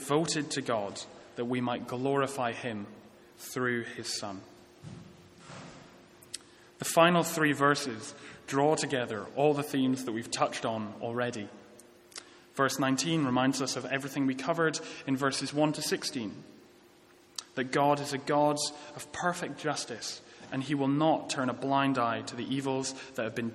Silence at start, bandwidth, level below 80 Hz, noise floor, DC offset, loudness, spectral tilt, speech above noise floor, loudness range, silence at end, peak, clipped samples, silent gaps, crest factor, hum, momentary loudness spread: 0 s; 15.5 kHz; -72 dBFS; -59 dBFS; under 0.1%; -31 LUFS; -4.5 dB/octave; 29 dB; 6 LU; 0 s; -8 dBFS; under 0.1%; none; 24 dB; none; 17 LU